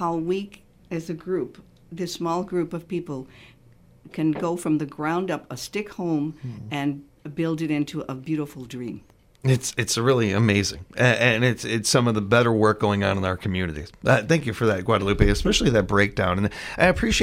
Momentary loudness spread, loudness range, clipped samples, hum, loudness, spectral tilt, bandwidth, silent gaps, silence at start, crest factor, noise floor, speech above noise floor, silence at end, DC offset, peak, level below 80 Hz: 14 LU; 9 LU; under 0.1%; none; -23 LUFS; -5 dB/octave; 16 kHz; none; 0 s; 24 dB; -52 dBFS; 29 dB; 0 s; under 0.1%; 0 dBFS; -40 dBFS